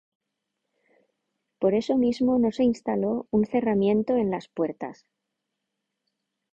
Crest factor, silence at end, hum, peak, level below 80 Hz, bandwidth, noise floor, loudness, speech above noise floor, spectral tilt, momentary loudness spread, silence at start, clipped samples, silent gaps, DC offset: 18 dB; 1.6 s; none; -10 dBFS; -60 dBFS; 7.8 kHz; -82 dBFS; -25 LUFS; 58 dB; -7.5 dB/octave; 7 LU; 1.6 s; under 0.1%; none; under 0.1%